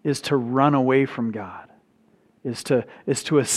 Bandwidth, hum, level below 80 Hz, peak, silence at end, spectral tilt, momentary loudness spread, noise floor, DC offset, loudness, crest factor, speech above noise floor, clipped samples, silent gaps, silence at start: 14.5 kHz; none; -68 dBFS; -4 dBFS; 0 s; -5 dB/octave; 16 LU; -60 dBFS; under 0.1%; -22 LUFS; 20 dB; 38 dB; under 0.1%; none; 0.05 s